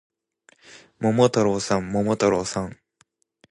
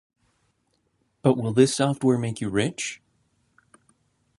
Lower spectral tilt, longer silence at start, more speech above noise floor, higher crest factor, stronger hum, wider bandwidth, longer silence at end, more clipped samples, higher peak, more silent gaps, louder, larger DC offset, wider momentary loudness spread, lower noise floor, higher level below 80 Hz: about the same, -5.5 dB/octave vs -5.5 dB/octave; second, 0.75 s vs 1.25 s; second, 43 dB vs 49 dB; about the same, 20 dB vs 22 dB; neither; about the same, 11 kHz vs 11.5 kHz; second, 0.75 s vs 1.45 s; neither; about the same, -4 dBFS vs -4 dBFS; neither; about the same, -22 LUFS vs -23 LUFS; neither; about the same, 10 LU vs 12 LU; second, -65 dBFS vs -71 dBFS; first, -54 dBFS vs -60 dBFS